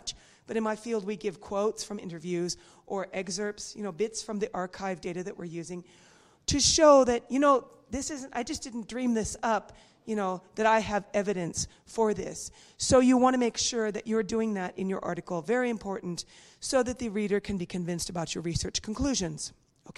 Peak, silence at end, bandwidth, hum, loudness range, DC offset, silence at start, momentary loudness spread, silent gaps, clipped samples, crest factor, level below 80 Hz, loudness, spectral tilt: -8 dBFS; 0.05 s; 13 kHz; none; 9 LU; under 0.1%; 0.05 s; 15 LU; none; under 0.1%; 22 dB; -52 dBFS; -29 LUFS; -4 dB/octave